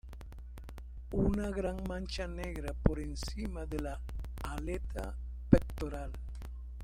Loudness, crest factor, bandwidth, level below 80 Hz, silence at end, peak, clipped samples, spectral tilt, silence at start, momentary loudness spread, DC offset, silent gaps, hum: -37 LUFS; 28 dB; 16 kHz; -40 dBFS; 0 s; -6 dBFS; under 0.1%; -7 dB/octave; 0.05 s; 19 LU; under 0.1%; none; none